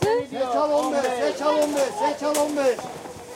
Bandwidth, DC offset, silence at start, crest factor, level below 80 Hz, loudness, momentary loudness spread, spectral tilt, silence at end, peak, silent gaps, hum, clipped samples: 16.5 kHz; under 0.1%; 0 s; 16 dB; -60 dBFS; -23 LUFS; 4 LU; -4 dB/octave; 0 s; -6 dBFS; none; none; under 0.1%